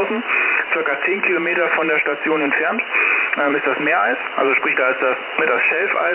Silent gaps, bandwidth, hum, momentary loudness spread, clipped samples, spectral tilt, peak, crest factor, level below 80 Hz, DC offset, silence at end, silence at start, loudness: none; 4 kHz; none; 3 LU; under 0.1%; -7 dB/octave; -4 dBFS; 14 dB; -70 dBFS; under 0.1%; 0 s; 0 s; -17 LUFS